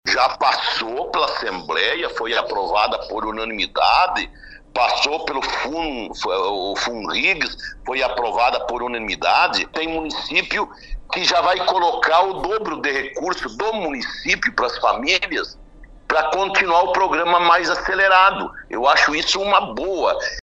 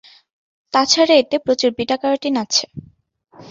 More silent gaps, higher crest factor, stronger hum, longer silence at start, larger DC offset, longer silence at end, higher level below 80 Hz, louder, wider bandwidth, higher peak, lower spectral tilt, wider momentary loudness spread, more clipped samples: neither; about the same, 20 dB vs 18 dB; neither; second, 0.05 s vs 0.75 s; neither; about the same, 0.05 s vs 0 s; first, -44 dBFS vs -58 dBFS; about the same, -19 LUFS vs -17 LUFS; first, 10 kHz vs 7.8 kHz; about the same, 0 dBFS vs -2 dBFS; about the same, -2 dB/octave vs -2.5 dB/octave; about the same, 9 LU vs 8 LU; neither